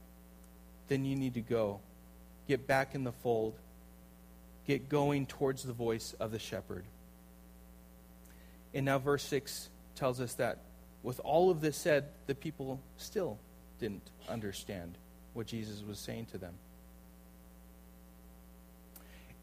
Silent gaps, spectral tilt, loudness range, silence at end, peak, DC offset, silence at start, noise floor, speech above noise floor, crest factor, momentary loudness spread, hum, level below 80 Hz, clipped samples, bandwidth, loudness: none; -5.5 dB/octave; 12 LU; 0 s; -16 dBFS; under 0.1%; 0 s; -57 dBFS; 21 dB; 22 dB; 26 LU; none; -60 dBFS; under 0.1%; 15.5 kHz; -37 LUFS